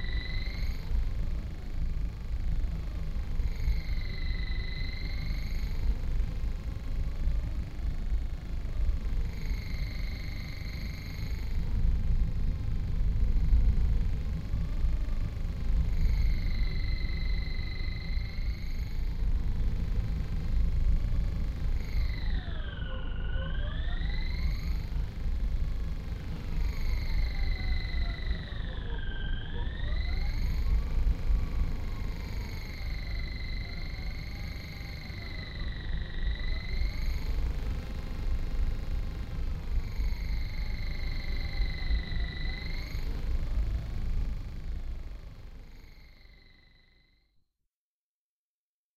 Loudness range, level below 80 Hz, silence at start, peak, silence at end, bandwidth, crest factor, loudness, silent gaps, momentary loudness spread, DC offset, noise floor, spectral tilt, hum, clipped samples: 6 LU; -30 dBFS; 0 s; -12 dBFS; 2.65 s; 13 kHz; 18 dB; -35 LUFS; none; 7 LU; under 0.1%; under -90 dBFS; -6.5 dB/octave; none; under 0.1%